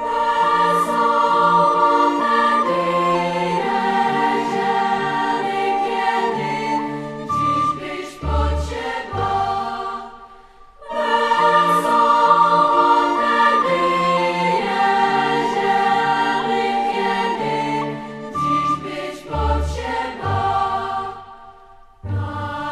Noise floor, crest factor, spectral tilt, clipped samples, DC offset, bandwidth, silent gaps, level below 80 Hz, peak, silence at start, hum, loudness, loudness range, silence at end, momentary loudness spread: -45 dBFS; 18 dB; -5.5 dB/octave; under 0.1%; under 0.1%; 14 kHz; none; -36 dBFS; -2 dBFS; 0 s; none; -18 LUFS; 7 LU; 0 s; 12 LU